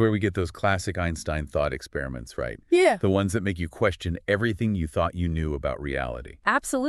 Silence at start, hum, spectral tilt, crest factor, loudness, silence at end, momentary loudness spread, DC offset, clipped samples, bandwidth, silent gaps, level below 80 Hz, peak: 0 s; none; -6 dB/octave; 20 dB; -26 LUFS; 0 s; 11 LU; under 0.1%; under 0.1%; 13 kHz; none; -40 dBFS; -6 dBFS